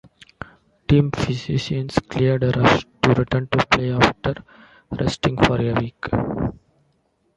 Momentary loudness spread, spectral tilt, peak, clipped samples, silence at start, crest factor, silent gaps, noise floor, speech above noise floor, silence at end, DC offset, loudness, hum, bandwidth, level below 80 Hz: 16 LU; -6.5 dB/octave; 0 dBFS; under 0.1%; 0.9 s; 20 dB; none; -65 dBFS; 46 dB; 0.85 s; under 0.1%; -20 LUFS; none; 11 kHz; -40 dBFS